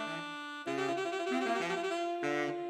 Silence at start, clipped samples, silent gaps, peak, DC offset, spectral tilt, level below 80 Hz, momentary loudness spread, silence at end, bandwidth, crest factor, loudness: 0 s; under 0.1%; none; -20 dBFS; under 0.1%; -4 dB/octave; -86 dBFS; 7 LU; 0 s; 14.5 kHz; 14 dB; -35 LUFS